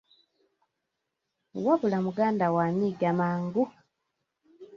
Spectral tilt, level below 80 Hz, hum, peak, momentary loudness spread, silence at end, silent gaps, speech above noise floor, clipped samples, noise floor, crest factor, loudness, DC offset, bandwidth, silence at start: -9 dB/octave; -70 dBFS; none; -14 dBFS; 6 LU; 0 s; none; 57 dB; under 0.1%; -83 dBFS; 16 dB; -27 LUFS; under 0.1%; 7.2 kHz; 1.55 s